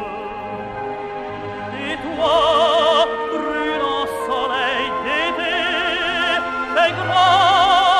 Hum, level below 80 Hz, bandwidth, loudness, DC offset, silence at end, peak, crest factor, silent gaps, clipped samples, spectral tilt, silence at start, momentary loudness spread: none; -48 dBFS; 13 kHz; -18 LUFS; under 0.1%; 0 s; -2 dBFS; 16 dB; none; under 0.1%; -3.5 dB/octave; 0 s; 15 LU